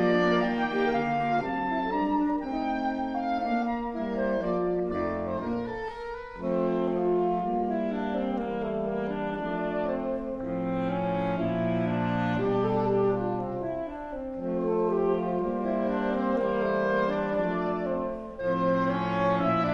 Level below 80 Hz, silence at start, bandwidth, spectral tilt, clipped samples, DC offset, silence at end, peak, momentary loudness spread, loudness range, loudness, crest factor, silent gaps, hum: -50 dBFS; 0 s; 7 kHz; -8.5 dB/octave; under 0.1%; under 0.1%; 0 s; -14 dBFS; 6 LU; 3 LU; -28 LUFS; 14 dB; none; none